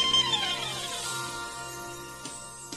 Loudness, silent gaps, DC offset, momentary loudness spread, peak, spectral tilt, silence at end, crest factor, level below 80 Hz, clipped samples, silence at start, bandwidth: -30 LUFS; none; under 0.1%; 16 LU; -14 dBFS; -1 dB/octave; 0 s; 18 dB; -58 dBFS; under 0.1%; 0 s; 13 kHz